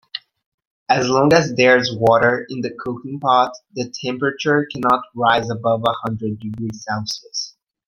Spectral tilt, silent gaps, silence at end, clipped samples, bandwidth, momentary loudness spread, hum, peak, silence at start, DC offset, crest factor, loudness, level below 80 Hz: -5 dB/octave; 0.46-0.58 s, 0.65-0.86 s; 0.4 s; under 0.1%; 15 kHz; 14 LU; none; 0 dBFS; 0.15 s; under 0.1%; 18 dB; -18 LUFS; -56 dBFS